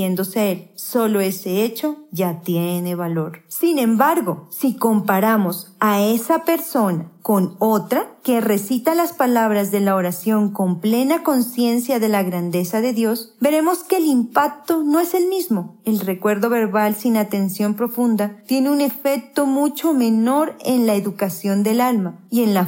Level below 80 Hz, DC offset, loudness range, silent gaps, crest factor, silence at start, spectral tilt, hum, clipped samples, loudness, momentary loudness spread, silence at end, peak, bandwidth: -78 dBFS; under 0.1%; 2 LU; none; 16 dB; 0 s; -5.5 dB/octave; none; under 0.1%; -19 LUFS; 6 LU; 0 s; -2 dBFS; 16.5 kHz